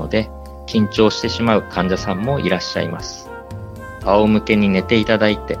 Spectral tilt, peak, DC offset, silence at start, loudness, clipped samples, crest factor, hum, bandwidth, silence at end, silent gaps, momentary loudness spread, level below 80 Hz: -6 dB/octave; 0 dBFS; under 0.1%; 0 s; -17 LUFS; under 0.1%; 18 dB; none; 10 kHz; 0 s; none; 18 LU; -38 dBFS